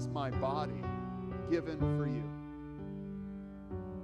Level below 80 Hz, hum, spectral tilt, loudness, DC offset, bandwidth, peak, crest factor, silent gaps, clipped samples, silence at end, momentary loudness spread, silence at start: -54 dBFS; none; -8.5 dB/octave; -38 LUFS; under 0.1%; 9.4 kHz; -22 dBFS; 16 dB; none; under 0.1%; 0 s; 12 LU; 0 s